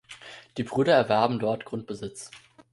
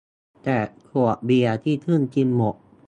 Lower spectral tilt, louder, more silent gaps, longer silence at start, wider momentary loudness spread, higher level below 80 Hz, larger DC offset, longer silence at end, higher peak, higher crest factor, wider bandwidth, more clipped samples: second, -5.5 dB/octave vs -8.5 dB/octave; second, -26 LUFS vs -22 LUFS; neither; second, 0.1 s vs 0.45 s; first, 22 LU vs 6 LU; second, -64 dBFS vs -58 dBFS; neither; about the same, 0.35 s vs 0.35 s; about the same, -6 dBFS vs -8 dBFS; first, 20 dB vs 14 dB; first, 11.5 kHz vs 8.8 kHz; neither